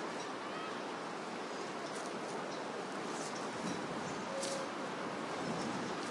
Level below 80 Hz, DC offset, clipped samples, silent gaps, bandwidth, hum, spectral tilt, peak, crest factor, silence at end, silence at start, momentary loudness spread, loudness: -78 dBFS; under 0.1%; under 0.1%; none; 11.5 kHz; none; -3.5 dB/octave; -24 dBFS; 16 dB; 0 s; 0 s; 3 LU; -41 LUFS